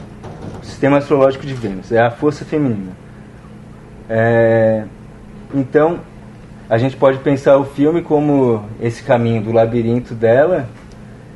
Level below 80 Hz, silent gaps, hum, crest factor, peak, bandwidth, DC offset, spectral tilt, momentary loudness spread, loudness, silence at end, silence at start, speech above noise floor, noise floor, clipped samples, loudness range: -44 dBFS; none; none; 16 dB; 0 dBFS; 11 kHz; under 0.1%; -8 dB/octave; 15 LU; -15 LUFS; 0 s; 0 s; 22 dB; -36 dBFS; under 0.1%; 4 LU